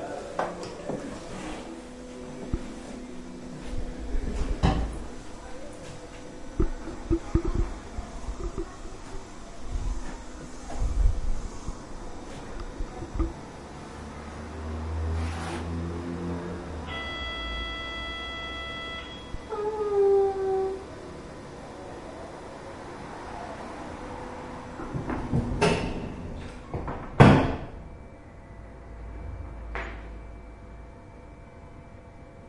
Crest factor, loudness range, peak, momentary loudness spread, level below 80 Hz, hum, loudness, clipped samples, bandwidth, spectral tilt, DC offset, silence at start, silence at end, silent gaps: 30 dB; 14 LU; -2 dBFS; 17 LU; -36 dBFS; none; -31 LUFS; under 0.1%; 11.5 kHz; -6.5 dB/octave; under 0.1%; 0 s; 0 s; none